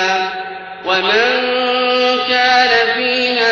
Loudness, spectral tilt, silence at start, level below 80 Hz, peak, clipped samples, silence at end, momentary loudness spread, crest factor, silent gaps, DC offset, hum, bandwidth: -13 LUFS; -2 dB/octave; 0 s; -54 dBFS; -2 dBFS; under 0.1%; 0 s; 11 LU; 12 dB; none; under 0.1%; none; 7.2 kHz